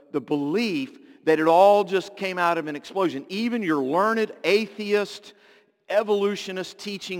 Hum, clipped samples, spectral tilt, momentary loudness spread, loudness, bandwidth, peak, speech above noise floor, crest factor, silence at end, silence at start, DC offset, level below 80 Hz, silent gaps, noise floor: none; under 0.1%; -5 dB/octave; 14 LU; -23 LUFS; 17 kHz; -6 dBFS; 34 dB; 18 dB; 0 s; 0.15 s; under 0.1%; -78 dBFS; none; -57 dBFS